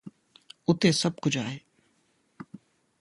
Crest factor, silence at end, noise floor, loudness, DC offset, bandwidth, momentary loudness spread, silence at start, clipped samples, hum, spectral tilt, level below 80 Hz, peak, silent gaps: 22 dB; 0.45 s; -70 dBFS; -26 LUFS; under 0.1%; 11.5 kHz; 25 LU; 0.05 s; under 0.1%; none; -5 dB/octave; -64 dBFS; -8 dBFS; none